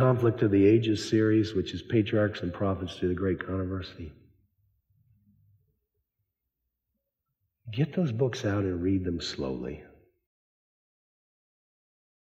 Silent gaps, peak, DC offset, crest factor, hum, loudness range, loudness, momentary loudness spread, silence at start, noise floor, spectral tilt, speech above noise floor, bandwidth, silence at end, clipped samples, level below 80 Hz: none; -10 dBFS; under 0.1%; 18 dB; none; 14 LU; -28 LUFS; 14 LU; 0 s; -84 dBFS; -7 dB/octave; 57 dB; 9.2 kHz; 2.45 s; under 0.1%; -60 dBFS